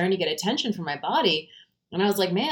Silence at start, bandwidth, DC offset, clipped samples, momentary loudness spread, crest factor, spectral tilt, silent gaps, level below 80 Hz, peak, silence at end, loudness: 0 s; 19.5 kHz; under 0.1%; under 0.1%; 6 LU; 16 dB; -4.5 dB/octave; none; -70 dBFS; -8 dBFS; 0 s; -25 LUFS